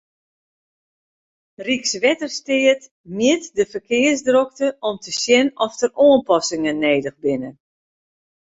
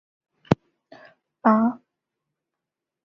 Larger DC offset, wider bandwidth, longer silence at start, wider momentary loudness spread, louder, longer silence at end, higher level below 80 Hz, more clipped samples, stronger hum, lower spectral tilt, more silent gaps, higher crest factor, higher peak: neither; first, 8 kHz vs 7 kHz; first, 1.6 s vs 0.5 s; about the same, 8 LU vs 6 LU; first, -18 LUFS vs -23 LUFS; second, 0.95 s vs 1.3 s; about the same, -62 dBFS vs -58 dBFS; neither; neither; second, -3 dB/octave vs -8.5 dB/octave; first, 2.91-3.04 s vs none; second, 18 dB vs 24 dB; about the same, -2 dBFS vs -2 dBFS